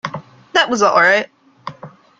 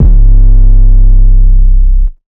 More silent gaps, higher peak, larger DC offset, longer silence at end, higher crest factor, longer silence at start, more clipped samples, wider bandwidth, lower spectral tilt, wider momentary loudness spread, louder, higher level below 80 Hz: neither; about the same, -2 dBFS vs 0 dBFS; neither; first, 0.3 s vs 0.15 s; first, 16 dB vs 2 dB; about the same, 0.05 s vs 0 s; second, under 0.1% vs 30%; first, 9.2 kHz vs 0.8 kHz; second, -3 dB/octave vs -13 dB/octave; first, 22 LU vs 3 LU; second, -14 LUFS vs -10 LUFS; second, -62 dBFS vs -2 dBFS